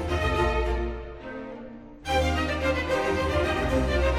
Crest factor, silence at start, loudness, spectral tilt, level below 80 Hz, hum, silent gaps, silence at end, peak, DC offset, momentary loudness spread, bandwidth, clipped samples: 14 dB; 0 s; -26 LUFS; -6 dB/octave; -32 dBFS; none; none; 0 s; -12 dBFS; under 0.1%; 14 LU; 14.5 kHz; under 0.1%